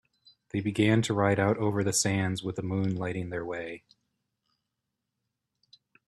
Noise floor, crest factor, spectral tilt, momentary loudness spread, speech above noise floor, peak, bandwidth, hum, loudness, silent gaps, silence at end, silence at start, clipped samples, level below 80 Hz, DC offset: -84 dBFS; 20 dB; -5 dB/octave; 11 LU; 57 dB; -10 dBFS; 13 kHz; none; -28 LUFS; none; 2.3 s; 0.55 s; under 0.1%; -64 dBFS; under 0.1%